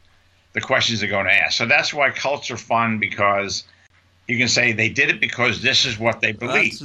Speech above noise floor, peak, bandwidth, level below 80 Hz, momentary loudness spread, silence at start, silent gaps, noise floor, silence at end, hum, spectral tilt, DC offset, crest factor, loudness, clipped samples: 36 dB; -2 dBFS; 12 kHz; -56 dBFS; 9 LU; 0.55 s; none; -56 dBFS; 0 s; none; -3 dB/octave; under 0.1%; 18 dB; -18 LUFS; under 0.1%